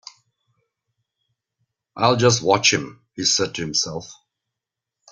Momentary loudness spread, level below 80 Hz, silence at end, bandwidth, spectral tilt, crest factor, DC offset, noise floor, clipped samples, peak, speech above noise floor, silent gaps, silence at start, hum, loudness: 11 LU; -58 dBFS; 1 s; 10.5 kHz; -3 dB/octave; 22 dB; under 0.1%; -85 dBFS; under 0.1%; -2 dBFS; 65 dB; none; 1.95 s; none; -19 LUFS